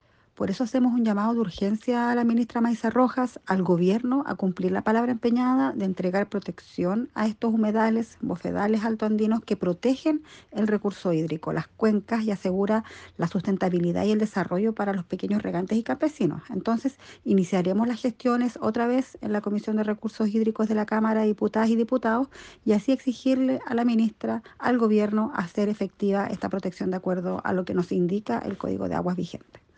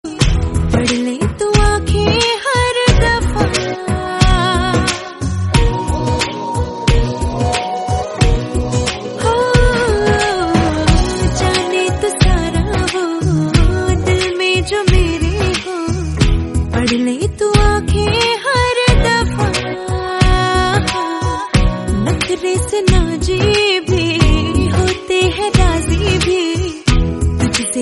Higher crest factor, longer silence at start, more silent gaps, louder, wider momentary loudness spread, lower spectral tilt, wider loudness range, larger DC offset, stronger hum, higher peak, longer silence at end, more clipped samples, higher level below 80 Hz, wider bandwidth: about the same, 16 dB vs 14 dB; first, 0.4 s vs 0.05 s; neither; second, -26 LUFS vs -15 LUFS; about the same, 7 LU vs 6 LU; first, -7.5 dB/octave vs -5 dB/octave; about the same, 2 LU vs 2 LU; neither; neither; second, -8 dBFS vs 0 dBFS; first, 0.2 s vs 0 s; neither; second, -62 dBFS vs -20 dBFS; second, 8.8 kHz vs 11.5 kHz